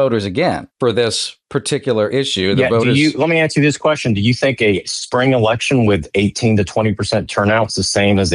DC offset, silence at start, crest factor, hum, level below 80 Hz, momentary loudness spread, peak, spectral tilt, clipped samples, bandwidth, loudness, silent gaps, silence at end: under 0.1%; 0 s; 12 dB; none; -46 dBFS; 5 LU; -4 dBFS; -5 dB/octave; under 0.1%; 11.5 kHz; -15 LUFS; none; 0 s